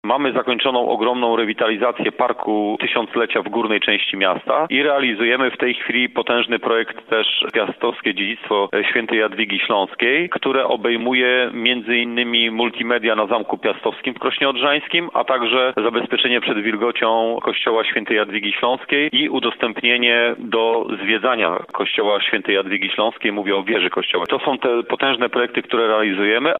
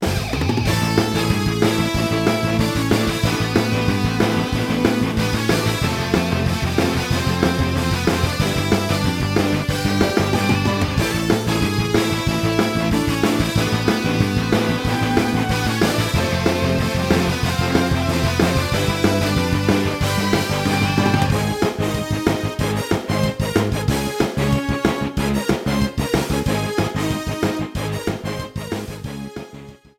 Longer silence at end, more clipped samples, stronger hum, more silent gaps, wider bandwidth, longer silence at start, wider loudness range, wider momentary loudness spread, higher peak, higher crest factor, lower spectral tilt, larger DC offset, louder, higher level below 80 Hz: second, 0 s vs 0.25 s; neither; neither; neither; second, 4.1 kHz vs 17 kHz; about the same, 0.05 s vs 0 s; about the same, 1 LU vs 2 LU; about the same, 4 LU vs 4 LU; about the same, 0 dBFS vs -2 dBFS; about the same, 18 dB vs 18 dB; about the same, -6.5 dB/octave vs -5.5 dB/octave; neither; about the same, -18 LUFS vs -19 LUFS; second, -72 dBFS vs -34 dBFS